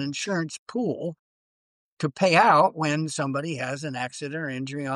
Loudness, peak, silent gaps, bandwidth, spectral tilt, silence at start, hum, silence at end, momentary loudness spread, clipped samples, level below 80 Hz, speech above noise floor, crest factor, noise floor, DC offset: -25 LUFS; -8 dBFS; 0.58-0.66 s, 1.19-1.97 s; 12 kHz; -5 dB/octave; 0 s; none; 0 s; 13 LU; under 0.1%; -72 dBFS; over 65 dB; 18 dB; under -90 dBFS; under 0.1%